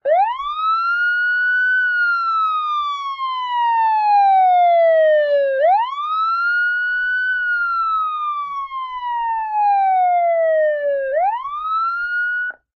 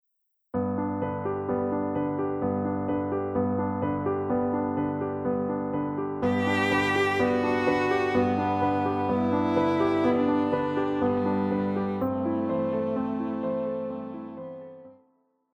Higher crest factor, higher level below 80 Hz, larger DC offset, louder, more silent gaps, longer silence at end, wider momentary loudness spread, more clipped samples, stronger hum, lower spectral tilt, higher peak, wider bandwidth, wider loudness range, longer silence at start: second, 10 dB vs 16 dB; about the same, -62 dBFS vs -60 dBFS; neither; first, -17 LUFS vs -27 LUFS; neither; second, 0.25 s vs 0.65 s; about the same, 9 LU vs 7 LU; neither; neither; second, -0.5 dB/octave vs -7.5 dB/octave; about the same, -8 dBFS vs -10 dBFS; second, 6 kHz vs 10.5 kHz; about the same, 4 LU vs 4 LU; second, 0.05 s vs 0.55 s